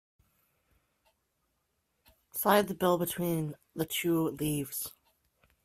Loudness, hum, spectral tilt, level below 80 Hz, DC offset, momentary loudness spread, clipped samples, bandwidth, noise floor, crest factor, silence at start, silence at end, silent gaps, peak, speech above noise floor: -31 LUFS; none; -5 dB/octave; -66 dBFS; under 0.1%; 12 LU; under 0.1%; 16 kHz; -79 dBFS; 24 dB; 2.35 s; 0.75 s; none; -10 dBFS; 49 dB